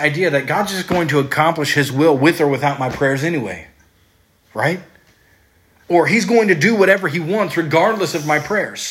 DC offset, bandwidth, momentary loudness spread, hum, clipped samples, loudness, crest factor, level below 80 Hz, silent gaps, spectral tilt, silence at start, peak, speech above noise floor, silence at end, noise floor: under 0.1%; 16.5 kHz; 7 LU; none; under 0.1%; -16 LUFS; 16 dB; -54 dBFS; none; -5 dB/octave; 0 s; 0 dBFS; 40 dB; 0 s; -56 dBFS